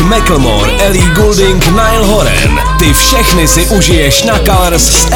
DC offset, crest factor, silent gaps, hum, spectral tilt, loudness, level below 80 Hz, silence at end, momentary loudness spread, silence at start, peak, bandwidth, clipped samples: under 0.1%; 6 dB; none; none; -3.5 dB/octave; -7 LUFS; -12 dBFS; 0 s; 3 LU; 0 s; 0 dBFS; 19.5 kHz; 1%